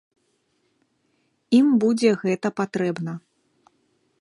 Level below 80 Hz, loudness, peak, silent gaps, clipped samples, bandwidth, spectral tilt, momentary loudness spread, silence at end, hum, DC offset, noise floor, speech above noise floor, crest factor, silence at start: -74 dBFS; -21 LUFS; -6 dBFS; none; under 0.1%; 11 kHz; -6.5 dB/octave; 14 LU; 1.05 s; none; under 0.1%; -69 dBFS; 49 dB; 18 dB; 1.5 s